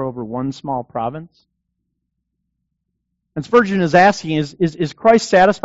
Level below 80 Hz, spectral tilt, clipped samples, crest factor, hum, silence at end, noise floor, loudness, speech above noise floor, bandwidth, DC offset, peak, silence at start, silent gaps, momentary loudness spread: -52 dBFS; -4.5 dB/octave; under 0.1%; 16 dB; none; 0.05 s; -74 dBFS; -16 LUFS; 58 dB; 8 kHz; under 0.1%; -2 dBFS; 0 s; none; 14 LU